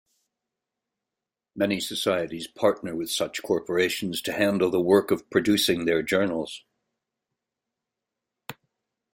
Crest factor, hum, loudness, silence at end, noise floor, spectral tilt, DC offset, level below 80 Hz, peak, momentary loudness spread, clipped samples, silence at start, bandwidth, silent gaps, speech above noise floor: 22 dB; none; -25 LUFS; 0.6 s; -88 dBFS; -4 dB/octave; under 0.1%; -64 dBFS; -6 dBFS; 13 LU; under 0.1%; 1.55 s; 16.5 kHz; none; 63 dB